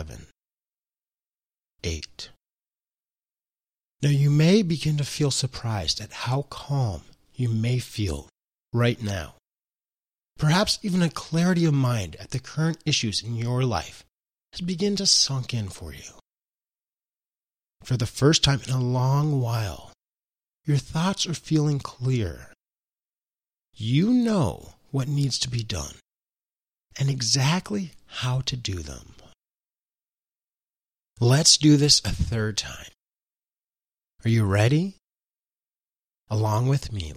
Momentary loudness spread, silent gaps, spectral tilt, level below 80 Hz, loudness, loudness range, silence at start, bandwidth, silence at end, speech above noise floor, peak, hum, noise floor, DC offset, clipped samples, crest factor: 16 LU; none; -4.5 dB/octave; -48 dBFS; -24 LUFS; 7 LU; 0 s; 15 kHz; 0 s; over 66 dB; -2 dBFS; none; under -90 dBFS; under 0.1%; under 0.1%; 24 dB